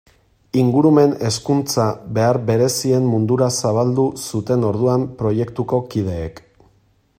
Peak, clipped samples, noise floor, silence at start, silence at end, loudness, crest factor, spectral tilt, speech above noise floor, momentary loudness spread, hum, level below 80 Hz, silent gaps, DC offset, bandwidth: -2 dBFS; under 0.1%; -58 dBFS; 0.55 s; 0.85 s; -18 LUFS; 16 dB; -6 dB/octave; 41 dB; 8 LU; none; -50 dBFS; none; under 0.1%; 16 kHz